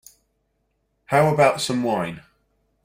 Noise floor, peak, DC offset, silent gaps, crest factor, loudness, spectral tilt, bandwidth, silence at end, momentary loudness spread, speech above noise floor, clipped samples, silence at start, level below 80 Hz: -71 dBFS; -2 dBFS; under 0.1%; none; 20 dB; -20 LUFS; -5 dB/octave; 16 kHz; 0.65 s; 13 LU; 52 dB; under 0.1%; 1.1 s; -58 dBFS